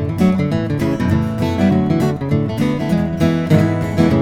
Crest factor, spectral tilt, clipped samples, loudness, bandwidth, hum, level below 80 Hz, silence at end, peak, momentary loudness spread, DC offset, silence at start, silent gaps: 14 dB; -8 dB/octave; under 0.1%; -17 LUFS; 16 kHz; none; -38 dBFS; 0 s; 0 dBFS; 4 LU; under 0.1%; 0 s; none